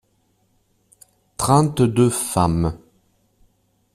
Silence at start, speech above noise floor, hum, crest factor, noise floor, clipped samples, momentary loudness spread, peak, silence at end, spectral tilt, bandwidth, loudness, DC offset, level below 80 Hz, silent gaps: 1.4 s; 47 dB; none; 18 dB; -64 dBFS; under 0.1%; 13 LU; -2 dBFS; 1.15 s; -6 dB/octave; 15 kHz; -19 LUFS; under 0.1%; -44 dBFS; none